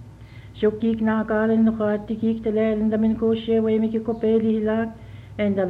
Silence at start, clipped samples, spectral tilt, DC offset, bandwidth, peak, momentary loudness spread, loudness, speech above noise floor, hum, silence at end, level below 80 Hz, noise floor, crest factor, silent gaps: 0 s; under 0.1%; -9 dB/octave; under 0.1%; 4.2 kHz; -8 dBFS; 6 LU; -22 LUFS; 21 dB; none; 0 s; -48 dBFS; -42 dBFS; 12 dB; none